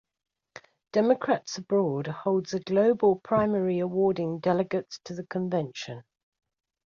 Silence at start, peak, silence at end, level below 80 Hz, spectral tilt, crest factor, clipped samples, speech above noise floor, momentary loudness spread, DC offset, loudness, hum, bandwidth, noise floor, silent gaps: 0.95 s; -10 dBFS; 0.85 s; -66 dBFS; -6.5 dB/octave; 18 dB; under 0.1%; 26 dB; 12 LU; under 0.1%; -27 LUFS; none; 7.4 kHz; -52 dBFS; none